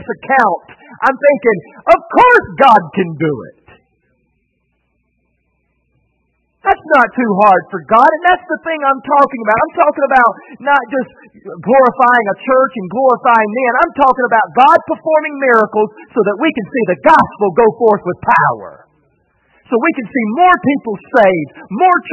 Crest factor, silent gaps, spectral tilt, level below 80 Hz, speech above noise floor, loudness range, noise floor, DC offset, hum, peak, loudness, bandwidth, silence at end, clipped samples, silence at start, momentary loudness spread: 12 dB; none; -7 dB/octave; -50 dBFS; 52 dB; 4 LU; -64 dBFS; under 0.1%; none; 0 dBFS; -12 LUFS; 9.4 kHz; 0 s; 0.2%; 0 s; 10 LU